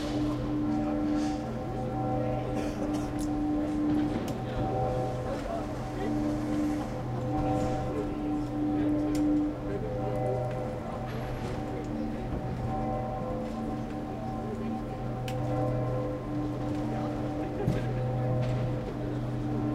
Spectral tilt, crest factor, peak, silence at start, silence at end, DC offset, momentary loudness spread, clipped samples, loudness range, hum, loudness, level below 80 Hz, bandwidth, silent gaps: -8 dB/octave; 14 dB; -16 dBFS; 0 s; 0 s; under 0.1%; 6 LU; under 0.1%; 4 LU; none; -32 LUFS; -44 dBFS; 13.5 kHz; none